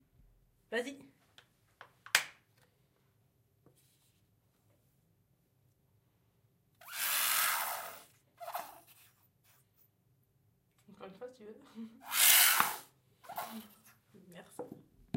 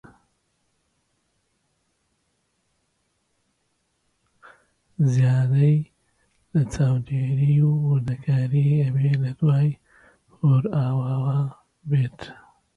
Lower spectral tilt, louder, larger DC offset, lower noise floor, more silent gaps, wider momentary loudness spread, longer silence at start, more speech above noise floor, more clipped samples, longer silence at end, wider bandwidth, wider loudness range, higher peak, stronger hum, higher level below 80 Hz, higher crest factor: second, 0.5 dB/octave vs -9 dB/octave; second, -29 LUFS vs -22 LUFS; neither; about the same, -74 dBFS vs -72 dBFS; neither; first, 27 LU vs 10 LU; second, 0.7 s vs 5 s; second, 31 dB vs 51 dB; neither; about the same, 0.45 s vs 0.45 s; first, 16 kHz vs 7.2 kHz; first, 17 LU vs 3 LU; about the same, -6 dBFS vs -8 dBFS; neither; second, -80 dBFS vs -56 dBFS; first, 32 dB vs 16 dB